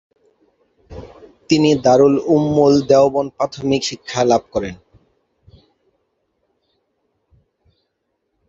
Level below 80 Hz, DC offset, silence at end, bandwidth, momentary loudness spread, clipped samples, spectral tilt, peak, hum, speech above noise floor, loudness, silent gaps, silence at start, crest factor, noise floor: -50 dBFS; under 0.1%; 3.75 s; 7.8 kHz; 14 LU; under 0.1%; -5.5 dB/octave; 0 dBFS; none; 57 dB; -15 LUFS; none; 0.9 s; 18 dB; -72 dBFS